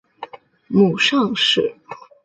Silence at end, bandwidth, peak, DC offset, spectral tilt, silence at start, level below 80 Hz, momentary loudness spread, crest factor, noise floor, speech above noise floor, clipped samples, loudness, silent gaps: 0.3 s; 9 kHz; -4 dBFS; under 0.1%; -4.5 dB/octave; 0.2 s; -62 dBFS; 22 LU; 16 dB; -38 dBFS; 21 dB; under 0.1%; -17 LUFS; none